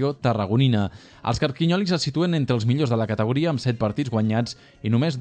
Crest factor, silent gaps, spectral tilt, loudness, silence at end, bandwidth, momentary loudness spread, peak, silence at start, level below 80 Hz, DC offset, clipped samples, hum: 16 dB; none; -7 dB/octave; -23 LUFS; 0 s; 9.4 kHz; 6 LU; -6 dBFS; 0 s; -50 dBFS; under 0.1%; under 0.1%; none